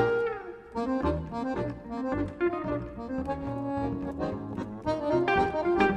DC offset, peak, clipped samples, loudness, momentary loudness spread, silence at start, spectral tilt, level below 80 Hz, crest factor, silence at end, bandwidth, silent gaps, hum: under 0.1%; -10 dBFS; under 0.1%; -31 LUFS; 9 LU; 0 s; -7.5 dB/octave; -46 dBFS; 20 dB; 0 s; 9.8 kHz; none; none